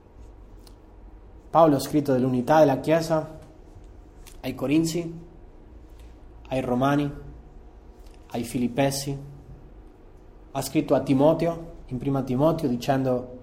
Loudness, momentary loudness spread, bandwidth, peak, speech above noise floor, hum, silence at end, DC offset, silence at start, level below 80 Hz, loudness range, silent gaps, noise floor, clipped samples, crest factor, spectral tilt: -24 LUFS; 17 LU; 16 kHz; -6 dBFS; 25 dB; none; 0 s; under 0.1%; 0.2 s; -48 dBFS; 8 LU; none; -48 dBFS; under 0.1%; 20 dB; -6.5 dB/octave